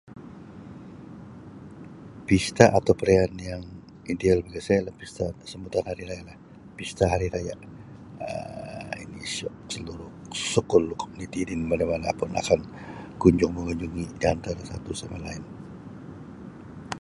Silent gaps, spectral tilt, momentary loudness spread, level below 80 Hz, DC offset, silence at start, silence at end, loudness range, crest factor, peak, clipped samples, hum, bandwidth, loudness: none; -5.5 dB/octave; 22 LU; -44 dBFS; under 0.1%; 0.05 s; 0.05 s; 8 LU; 26 dB; 0 dBFS; under 0.1%; none; 11.5 kHz; -26 LUFS